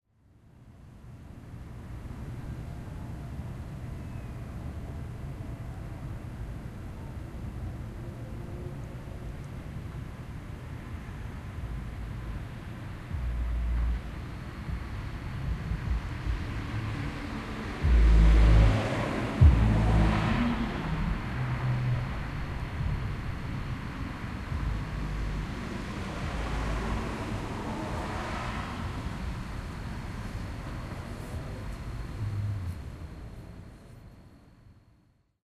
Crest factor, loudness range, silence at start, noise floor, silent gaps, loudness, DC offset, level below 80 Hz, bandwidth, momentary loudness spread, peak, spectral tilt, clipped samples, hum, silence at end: 22 dB; 15 LU; 0.55 s; -66 dBFS; none; -33 LUFS; under 0.1%; -34 dBFS; 11.5 kHz; 16 LU; -8 dBFS; -7 dB/octave; under 0.1%; none; 0.65 s